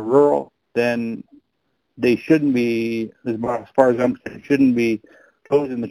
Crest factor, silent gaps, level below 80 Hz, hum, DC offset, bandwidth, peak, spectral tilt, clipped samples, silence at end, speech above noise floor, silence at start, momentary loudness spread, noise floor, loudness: 20 dB; none; -58 dBFS; none; under 0.1%; 14.5 kHz; 0 dBFS; -7 dB/octave; under 0.1%; 0 s; 53 dB; 0 s; 11 LU; -72 dBFS; -20 LUFS